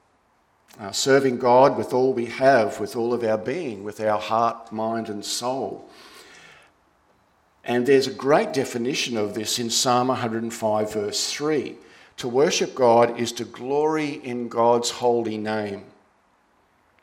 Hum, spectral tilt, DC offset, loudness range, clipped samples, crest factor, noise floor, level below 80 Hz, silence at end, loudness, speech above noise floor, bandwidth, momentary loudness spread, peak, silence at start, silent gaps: none; -4 dB/octave; under 0.1%; 6 LU; under 0.1%; 20 dB; -63 dBFS; -68 dBFS; 1.2 s; -22 LUFS; 41 dB; 16.5 kHz; 11 LU; -4 dBFS; 0.8 s; none